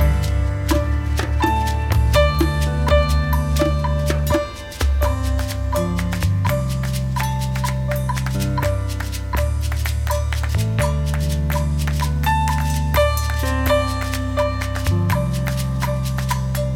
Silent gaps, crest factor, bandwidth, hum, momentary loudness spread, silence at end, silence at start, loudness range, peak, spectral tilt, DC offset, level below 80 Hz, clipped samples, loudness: none; 16 dB; 17 kHz; none; 5 LU; 0 s; 0 s; 3 LU; -4 dBFS; -6 dB/octave; under 0.1%; -22 dBFS; under 0.1%; -20 LUFS